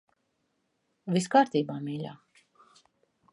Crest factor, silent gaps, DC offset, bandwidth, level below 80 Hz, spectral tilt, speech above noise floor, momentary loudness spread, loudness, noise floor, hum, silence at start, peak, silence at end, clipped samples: 22 dB; none; under 0.1%; 11.5 kHz; -80 dBFS; -5.5 dB/octave; 50 dB; 17 LU; -28 LUFS; -77 dBFS; none; 1.05 s; -10 dBFS; 1.2 s; under 0.1%